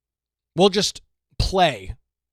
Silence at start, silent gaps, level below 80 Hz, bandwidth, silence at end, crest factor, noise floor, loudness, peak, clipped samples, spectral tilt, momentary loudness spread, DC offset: 0.55 s; none; -36 dBFS; 15 kHz; 0.4 s; 20 dB; -88 dBFS; -20 LUFS; -4 dBFS; under 0.1%; -4 dB/octave; 16 LU; under 0.1%